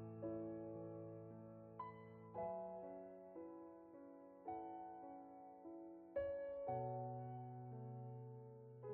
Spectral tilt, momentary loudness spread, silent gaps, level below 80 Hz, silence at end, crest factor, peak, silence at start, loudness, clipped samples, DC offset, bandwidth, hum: -9.5 dB/octave; 12 LU; none; -80 dBFS; 0 s; 18 dB; -34 dBFS; 0 s; -52 LUFS; under 0.1%; under 0.1%; 4.2 kHz; none